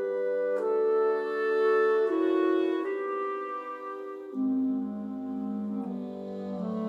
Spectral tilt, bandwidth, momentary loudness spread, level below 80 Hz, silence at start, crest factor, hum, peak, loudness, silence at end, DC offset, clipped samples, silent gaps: -8 dB/octave; 5.6 kHz; 12 LU; -82 dBFS; 0 s; 14 dB; none; -16 dBFS; -29 LUFS; 0 s; under 0.1%; under 0.1%; none